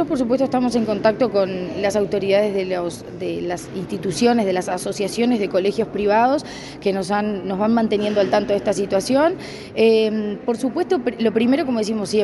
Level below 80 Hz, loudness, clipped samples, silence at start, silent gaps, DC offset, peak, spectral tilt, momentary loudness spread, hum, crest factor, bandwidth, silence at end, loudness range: -52 dBFS; -20 LUFS; under 0.1%; 0 s; none; under 0.1%; -4 dBFS; -5.5 dB/octave; 8 LU; none; 16 dB; 11.5 kHz; 0 s; 2 LU